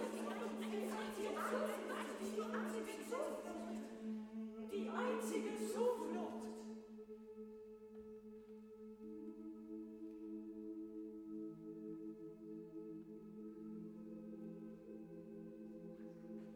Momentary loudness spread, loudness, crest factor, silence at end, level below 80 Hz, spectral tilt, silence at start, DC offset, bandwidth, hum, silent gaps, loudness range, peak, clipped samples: 14 LU; -47 LUFS; 18 dB; 0 s; -80 dBFS; -5 dB/octave; 0 s; under 0.1%; 18 kHz; none; none; 10 LU; -28 dBFS; under 0.1%